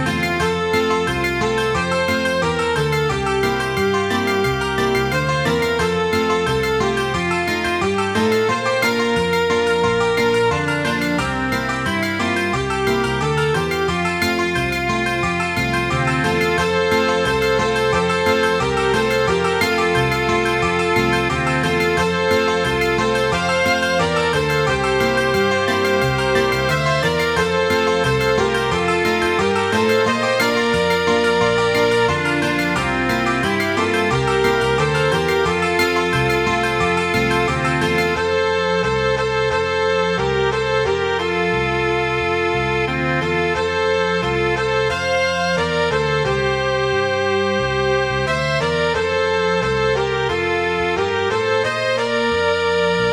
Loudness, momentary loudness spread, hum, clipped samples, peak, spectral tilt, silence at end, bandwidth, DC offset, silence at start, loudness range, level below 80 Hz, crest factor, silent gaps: -18 LUFS; 2 LU; none; under 0.1%; -4 dBFS; -5 dB/octave; 0 s; 18 kHz; 0.1%; 0 s; 2 LU; -38 dBFS; 14 dB; none